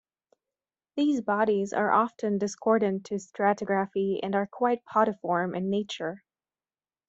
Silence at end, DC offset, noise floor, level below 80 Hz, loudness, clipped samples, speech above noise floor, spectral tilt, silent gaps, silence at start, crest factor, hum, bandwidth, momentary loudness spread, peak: 0.9 s; under 0.1%; under -90 dBFS; -74 dBFS; -27 LUFS; under 0.1%; over 63 dB; -6 dB/octave; none; 0.95 s; 18 dB; none; 8 kHz; 9 LU; -10 dBFS